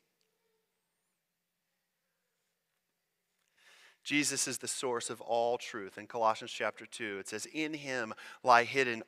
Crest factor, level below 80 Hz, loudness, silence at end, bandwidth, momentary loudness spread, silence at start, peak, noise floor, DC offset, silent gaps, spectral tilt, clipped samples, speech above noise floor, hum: 26 dB; -82 dBFS; -33 LUFS; 0.05 s; 15.5 kHz; 15 LU; 4.05 s; -10 dBFS; -85 dBFS; under 0.1%; none; -2 dB/octave; under 0.1%; 51 dB; none